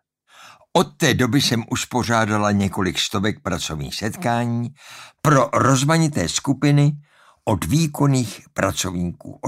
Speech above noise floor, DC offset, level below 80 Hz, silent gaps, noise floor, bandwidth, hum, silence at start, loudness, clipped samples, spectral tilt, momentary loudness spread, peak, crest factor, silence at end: 29 dB; under 0.1%; -46 dBFS; none; -49 dBFS; 16 kHz; none; 0.4 s; -20 LUFS; under 0.1%; -5 dB/octave; 10 LU; -2 dBFS; 18 dB; 0 s